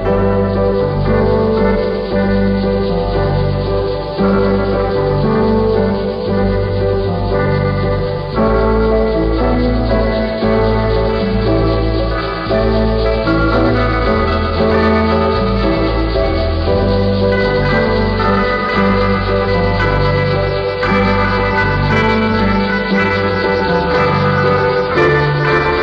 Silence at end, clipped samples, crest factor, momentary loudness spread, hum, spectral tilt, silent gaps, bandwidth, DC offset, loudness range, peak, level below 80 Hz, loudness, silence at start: 0 s; under 0.1%; 12 dB; 3 LU; none; -8.5 dB/octave; none; 6.4 kHz; under 0.1%; 2 LU; -2 dBFS; -22 dBFS; -14 LUFS; 0 s